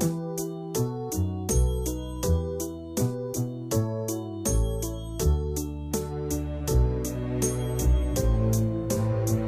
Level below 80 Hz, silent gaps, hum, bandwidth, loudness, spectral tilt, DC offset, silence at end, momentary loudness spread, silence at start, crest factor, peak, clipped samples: -32 dBFS; none; none; 16.5 kHz; -28 LUFS; -6 dB/octave; under 0.1%; 0 s; 7 LU; 0 s; 16 dB; -10 dBFS; under 0.1%